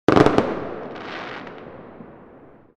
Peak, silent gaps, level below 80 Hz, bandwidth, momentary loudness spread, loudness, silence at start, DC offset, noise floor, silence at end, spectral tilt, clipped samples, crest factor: 0 dBFS; none; -46 dBFS; 10.5 kHz; 26 LU; -22 LUFS; 0.1 s; under 0.1%; -47 dBFS; 0.55 s; -7 dB/octave; under 0.1%; 22 dB